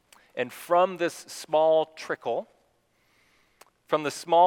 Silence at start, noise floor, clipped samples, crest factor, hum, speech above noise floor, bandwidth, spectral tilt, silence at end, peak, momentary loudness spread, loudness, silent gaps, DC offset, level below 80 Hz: 0.35 s; -68 dBFS; under 0.1%; 18 dB; none; 43 dB; 18 kHz; -4 dB/octave; 0 s; -8 dBFS; 11 LU; -27 LUFS; none; under 0.1%; -78 dBFS